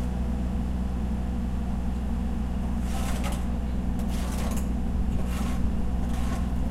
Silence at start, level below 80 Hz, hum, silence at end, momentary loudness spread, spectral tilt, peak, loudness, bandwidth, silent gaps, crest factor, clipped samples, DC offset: 0 s; -30 dBFS; none; 0 s; 1 LU; -7 dB/octave; -14 dBFS; -30 LUFS; 14 kHz; none; 14 dB; under 0.1%; under 0.1%